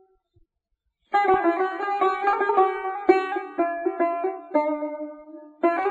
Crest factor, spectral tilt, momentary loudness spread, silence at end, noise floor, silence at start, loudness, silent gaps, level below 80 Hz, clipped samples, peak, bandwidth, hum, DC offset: 20 dB; -5.5 dB/octave; 9 LU; 0 s; -77 dBFS; 1.1 s; -24 LUFS; none; -64 dBFS; under 0.1%; -4 dBFS; 7.6 kHz; none; under 0.1%